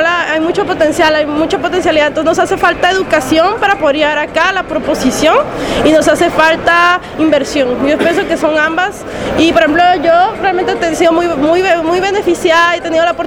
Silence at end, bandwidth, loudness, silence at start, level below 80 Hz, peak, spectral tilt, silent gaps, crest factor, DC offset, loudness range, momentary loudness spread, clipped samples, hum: 0 s; 17.5 kHz; -11 LUFS; 0 s; -38 dBFS; 0 dBFS; -4 dB/octave; none; 10 dB; under 0.1%; 1 LU; 5 LU; 0.2%; none